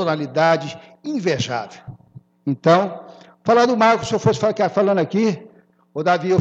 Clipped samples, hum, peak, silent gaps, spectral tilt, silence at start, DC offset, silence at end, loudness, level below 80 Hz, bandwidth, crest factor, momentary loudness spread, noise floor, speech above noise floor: under 0.1%; none; -2 dBFS; none; -6 dB/octave; 0 s; under 0.1%; 0 s; -19 LUFS; -58 dBFS; 8.2 kHz; 18 dB; 15 LU; -46 dBFS; 28 dB